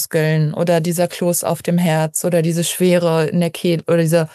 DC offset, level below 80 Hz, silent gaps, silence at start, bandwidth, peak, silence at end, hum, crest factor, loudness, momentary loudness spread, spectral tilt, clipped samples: under 0.1%; -64 dBFS; none; 0 s; 15.5 kHz; -4 dBFS; 0.05 s; none; 12 dB; -17 LUFS; 3 LU; -5.5 dB/octave; under 0.1%